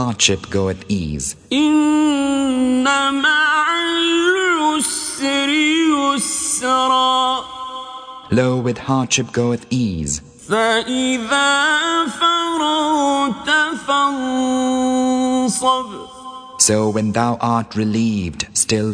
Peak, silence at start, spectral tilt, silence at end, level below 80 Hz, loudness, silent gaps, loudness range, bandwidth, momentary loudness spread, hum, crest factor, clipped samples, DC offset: 0 dBFS; 0 s; -3 dB/octave; 0 s; -46 dBFS; -17 LUFS; none; 3 LU; 10.5 kHz; 8 LU; none; 18 dB; under 0.1%; under 0.1%